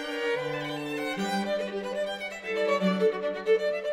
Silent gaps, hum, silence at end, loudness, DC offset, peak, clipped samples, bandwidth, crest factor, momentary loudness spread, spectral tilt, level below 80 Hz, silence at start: none; none; 0 s; -29 LUFS; under 0.1%; -14 dBFS; under 0.1%; 16 kHz; 16 dB; 7 LU; -5 dB/octave; -68 dBFS; 0 s